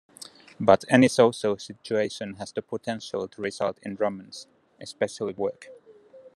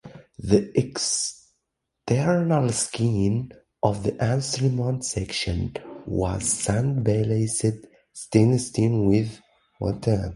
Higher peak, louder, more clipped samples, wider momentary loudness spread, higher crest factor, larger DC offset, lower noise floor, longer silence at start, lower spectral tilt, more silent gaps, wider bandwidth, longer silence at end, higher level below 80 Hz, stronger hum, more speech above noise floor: about the same, -2 dBFS vs -4 dBFS; about the same, -26 LUFS vs -24 LUFS; neither; first, 23 LU vs 10 LU; about the same, 24 dB vs 20 dB; neither; second, -51 dBFS vs -80 dBFS; first, 0.6 s vs 0.05 s; about the same, -5 dB/octave vs -5.5 dB/octave; neither; about the same, 12.5 kHz vs 11.5 kHz; about the same, 0.1 s vs 0 s; second, -70 dBFS vs -44 dBFS; neither; second, 25 dB vs 57 dB